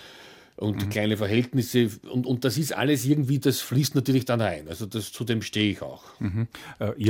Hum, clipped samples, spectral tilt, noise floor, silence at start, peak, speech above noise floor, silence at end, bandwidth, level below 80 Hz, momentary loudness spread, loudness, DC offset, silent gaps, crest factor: none; under 0.1%; -5.5 dB/octave; -49 dBFS; 0 s; -8 dBFS; 24 dB; 0 s; 17 kHz; -58 dBFS; 10 LU; -26 LUFS; under 0.1%; none; 18 dB